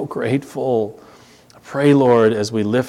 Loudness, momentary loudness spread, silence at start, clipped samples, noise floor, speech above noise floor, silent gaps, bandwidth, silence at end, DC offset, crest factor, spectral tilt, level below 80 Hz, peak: -17 LUFS; 10 LU; 0 s; under 0.1%; -47 dBFS; 30 dB; none; 13.5 kHz; 0 s; under 0.1%; 16 dB; -7 dB/octave; -62 dBFS; -2 dBFS